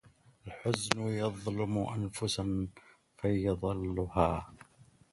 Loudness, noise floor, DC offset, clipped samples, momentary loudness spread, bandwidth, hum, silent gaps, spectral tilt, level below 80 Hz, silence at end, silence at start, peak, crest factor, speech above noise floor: -34 LUFS; -62 dBFS; under 0.1%; under 0.1%; 9 LU; 11.5 kHz; none; none; -5.5 dB/octave; -50 dBFS; 0.3 s; 0.45 s; -2 dBFS; 32 dB; 29 dB